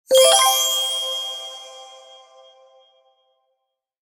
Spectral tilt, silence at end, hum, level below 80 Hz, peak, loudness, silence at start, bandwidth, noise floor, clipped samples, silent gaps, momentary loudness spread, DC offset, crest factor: 3 dB/octave; 2.15 s; none; -72 dBFS; -2 dBFS; -16 LUFS; 0.1 s; 18 kHz; -76 dBFS; under 0.1%; none; 25 LU; under 0.1%; 20 dB